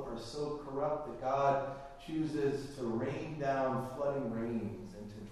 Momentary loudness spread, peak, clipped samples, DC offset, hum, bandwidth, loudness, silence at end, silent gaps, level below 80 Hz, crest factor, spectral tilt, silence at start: 11 LU; -18 dBFS; under 0.1%; under 0.1%; none; 13 kHz; -37 LUFS; 0 s; none; -58 dBFS; 18 dB; -7 dB/octave; 0 s